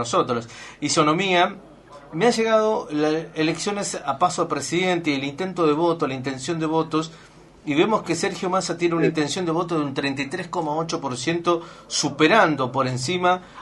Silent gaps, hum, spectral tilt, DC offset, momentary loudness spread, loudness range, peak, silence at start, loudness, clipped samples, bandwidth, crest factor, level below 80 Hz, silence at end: none; none; -4.5 dB/octave; under 0.1%; 8 LU; 2 LU; -2 dBFS; 0 s; -22 LUFS; under 0.1%; 11.5 kHz; 20 dB; -60 dBFS; 0 s